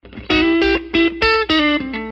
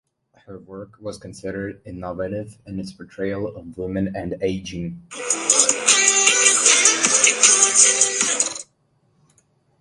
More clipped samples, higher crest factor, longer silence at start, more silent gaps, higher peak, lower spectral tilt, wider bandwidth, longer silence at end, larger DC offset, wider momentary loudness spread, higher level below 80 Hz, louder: neither; second, 14 dB vs 20 dB; second, 0.05 s vs 0.5 s; neither; second, -4 dBFS vs 0 dBFS; first, -5.5 dB/octave vs -0.5 dB/octave; second, 7.6 kHz vs 12 kHz; second, 0 s vs 1.15 s; neither; second, 4 LU vs 21 LU; first, -36 dBFS vs -52 dBFS; about the same, -15 LUFS vs -15 LUFS